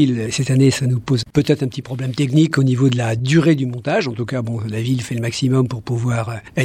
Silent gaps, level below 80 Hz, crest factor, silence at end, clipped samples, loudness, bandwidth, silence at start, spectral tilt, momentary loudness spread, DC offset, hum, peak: none; -50 dBFS; 14 dB; 0 s; under 0.1%; -18 LUFS; 13 kHz; 0 s; -6.5 dB/octave; 8 LU; under 0.1%; none; -2 dBFS